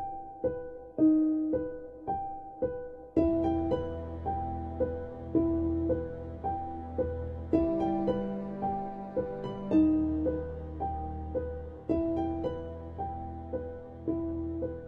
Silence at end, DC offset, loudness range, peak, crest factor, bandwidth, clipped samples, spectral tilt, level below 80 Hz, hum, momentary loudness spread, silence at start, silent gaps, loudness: 0 s; under 0.1%; 5 LU; -16 dBFS; 16 dB; 4.2 kHz; under 0.1%; -10.5 dB/octave; -48 dBFS; none; 12 LU; 0 s; none; -32 LUFS